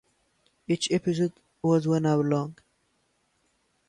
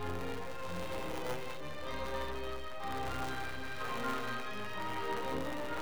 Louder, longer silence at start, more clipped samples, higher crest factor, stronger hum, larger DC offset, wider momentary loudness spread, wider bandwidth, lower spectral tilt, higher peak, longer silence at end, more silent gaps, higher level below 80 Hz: first, -26 LUFS vs -40 LUFS; first, 0.7 s vs 0 s; neither; about the same, 16 dB vs 14 dB; neither; second, under 0.1% vs 1%; about the same, 7 LU vs 5 LU; second, 11 kHz vs over 20 kHz; first, -6 dB/octave vs -4.5 dB/octave; first, -12 dBFS vs -24 dBFS; first, 1.35 s vs 0 s; neither; second, -66 dBFS vs -54 dBFS